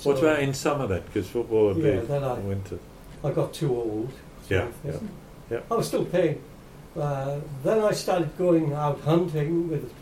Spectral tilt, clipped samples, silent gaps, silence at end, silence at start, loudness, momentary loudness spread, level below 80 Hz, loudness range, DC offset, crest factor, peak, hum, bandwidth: -6.5 dB/octave; under 0.1%; none; 0 s; 0 s; -26 LUFS; 14 LU; -50 dBFS; 4 LU; under 0.1%; 16 dB; -10 dBFS; none; 16 kHz